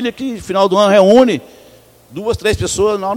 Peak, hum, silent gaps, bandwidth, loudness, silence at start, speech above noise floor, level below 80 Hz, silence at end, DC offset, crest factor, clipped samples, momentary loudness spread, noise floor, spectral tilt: 0 dBFS; none; none; 16.5 kHz; -13 LUFS; 0 s; 31 dB; -38 dBFS; 0 s; under 0.1%; 14 dB; 0.2%; 15 LU; -44 dBFS; -5 dB/octave